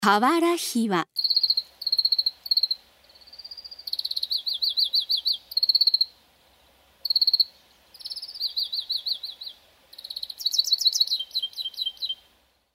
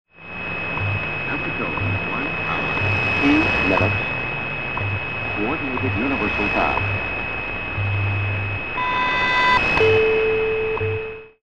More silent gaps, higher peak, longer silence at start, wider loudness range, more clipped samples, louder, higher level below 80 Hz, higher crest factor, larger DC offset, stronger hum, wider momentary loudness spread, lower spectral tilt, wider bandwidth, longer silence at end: neither; about the same, -6 dBFS vs -6 dBFS; about the same, 0 s vs 0.05 s; about the same, 3 LU vs 3 LU; neither; second, -23 LUFS vs -20 LUFS; second, -72 dBFS vs -40 dBFS; first, 22 dB vs 16 dB; second, under 0.1% vs 1%; neither; first, 16 LU vs 9 LU; second, -2 dB/octave vs -6.5 dB/octave; first, 16 kHz vs 8.2 kHz; first, 0.6 s vs 0 s